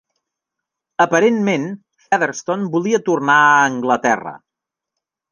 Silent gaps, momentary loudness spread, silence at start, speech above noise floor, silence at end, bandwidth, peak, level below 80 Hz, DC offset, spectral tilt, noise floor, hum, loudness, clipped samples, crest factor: none; 13 LU; 1 s; 68 dB; 0.95 s; 10 kHz; -2 dBFS; -66 dBFS; under 0.1%; -4.5 dB/octave; -84 dBFS; none; -16 LUFS; under 0.1%; 16 dB